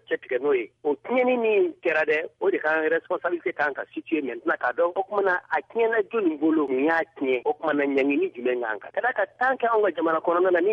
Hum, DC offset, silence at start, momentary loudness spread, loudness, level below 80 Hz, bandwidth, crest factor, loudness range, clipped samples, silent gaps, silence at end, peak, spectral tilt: none; under 0.1%; 0.1 s; 6 LU; -24 LUFS; -74 dBFS; 6.2 kHz; 14 dB; 2 LU; under 0.1%; none; 0 s; -10 dBFS; -6.5 dB/octave